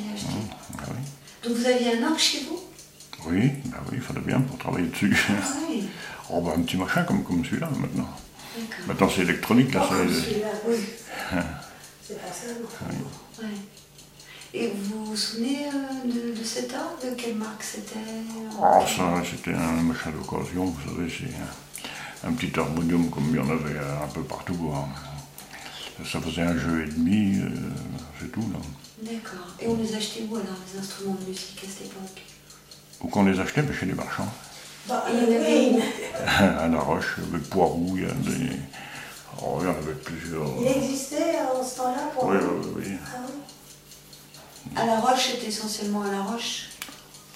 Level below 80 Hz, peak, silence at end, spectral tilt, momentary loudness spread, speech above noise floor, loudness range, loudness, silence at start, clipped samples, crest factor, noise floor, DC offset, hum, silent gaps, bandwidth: -52 dBFS; -4 dBFS; 0 s; -5 dB/octave; 17 LU; 23 dB; 8 LU; -27 LUFS; 0 s; under 0.1%; 24 dB; -49 dBFS; under 0.1%; none; none; 16 kHz